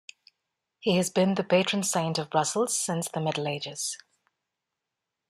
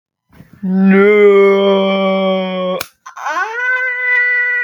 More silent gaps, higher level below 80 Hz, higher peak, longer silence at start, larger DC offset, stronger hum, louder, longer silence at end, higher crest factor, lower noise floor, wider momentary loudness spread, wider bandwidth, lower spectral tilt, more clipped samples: neither; second, -70 dBFS vs -64 dBFS; second, -8 dBFS vs 0 dBFS; first, 0.85 s vs 0.6 s; neither; neither; second, -27 LUFS vs -12 LUFS; first, 1.35 s vs 0 s; first, 20 dB vs 12 dB; first, -86 dBFS vs -44 dBFS; second, 8 LU vs 13 LU; second, 15 kHz vs 19.5 kHz; second, -4 dB/octave vs -6.5 dB/octave; neither